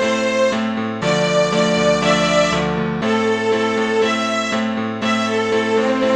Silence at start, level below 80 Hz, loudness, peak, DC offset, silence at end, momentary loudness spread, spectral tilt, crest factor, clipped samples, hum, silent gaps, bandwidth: 0 s; -46 dBFS; -17 LUFS; -4 dBFS; 0.1%; 0 s; 5 LU; -4.5 dB/octave; 14 dB; under 0.1%; none; none; 11 kHz